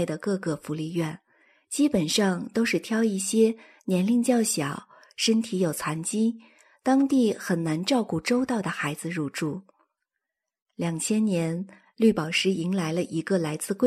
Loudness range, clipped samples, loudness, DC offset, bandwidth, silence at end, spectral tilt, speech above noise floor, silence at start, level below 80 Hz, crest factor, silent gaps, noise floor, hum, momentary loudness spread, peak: 5 LU; under 0.1%; -26 LUFS; under 0.1%; 15 kHz; 0 s; -4.5 dB/octave; 60 dB; 0 s; -66 dBFS; 16 dB; 10.62-10.66 s; -85 dBFS; none; 10 LU; -8 dBFS